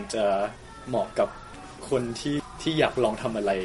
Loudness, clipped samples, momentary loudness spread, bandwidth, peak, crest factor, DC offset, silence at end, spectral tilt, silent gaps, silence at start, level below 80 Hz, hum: -27 LUFS; under 0.1%; 15 LU; 11.5 kHz; -6 dBFS; 22 dB; under 0.1%; 0 s; -5 dB/octave; none; 0 s; -50 dBFS; none